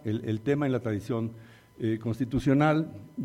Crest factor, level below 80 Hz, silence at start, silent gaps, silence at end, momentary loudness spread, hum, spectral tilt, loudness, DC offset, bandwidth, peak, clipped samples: 16 dB; -54 dBFS; 0.05 s; none; 0 s; 10 LU; none; -8 dB/octave; -28 LUFS; under 0.1%; 14.5 kHz; -12 dBFS; under 0.1%